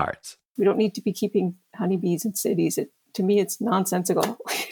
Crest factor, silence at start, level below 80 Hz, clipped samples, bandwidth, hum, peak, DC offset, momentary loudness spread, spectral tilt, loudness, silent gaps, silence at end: 18 dB; 0 s; -66 dBFS; under 0.1%; 19 kHz; none; -6 dBFS; under 0.1%; 8 LU; -5 dB/octave; -25 LUFS; 0.50-0.55 s; 0 s